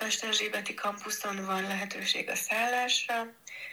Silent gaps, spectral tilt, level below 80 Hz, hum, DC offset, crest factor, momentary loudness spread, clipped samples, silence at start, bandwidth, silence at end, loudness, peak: none; -1 dB/octave; under -90 dBFS; none; under 0.1%; 18 dB; 7 LU; under 0.1%; 0 s; over 20 kHz; 0 s; -30 LUFS; -14 dBFS